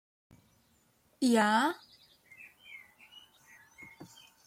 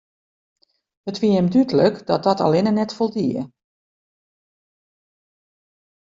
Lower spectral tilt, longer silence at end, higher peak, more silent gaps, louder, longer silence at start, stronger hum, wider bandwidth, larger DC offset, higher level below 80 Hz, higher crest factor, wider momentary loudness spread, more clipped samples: second, -4 dB/octave vs -7.5 dB/octave; second, 0.45 s vs 2.65 s; second, -16 dBFS vs -4 dBFS; neither; second, -28 LUFS vs -19 LUFS; first, 1.2 s vs 1.05 s; neither; first, 15.5 kHz vs 7.6 kHz; neither; second, -78 dBFS vs -62 dBFS; about the same, 20 dB vs 18 dB; first, 28 LU vs 13 LU; neither